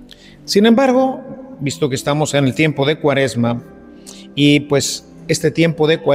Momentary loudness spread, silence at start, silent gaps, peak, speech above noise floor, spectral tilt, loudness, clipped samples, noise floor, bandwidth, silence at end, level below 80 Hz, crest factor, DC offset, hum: 14 LU; 0 s; none; 0 dBFS; 23 dB; -5 dB/octave; -16 LUFS; under 0.1%; -37 dBFS; 16 kHz; 0 s; -50 dBFS; 16 dB; under 0.1%; none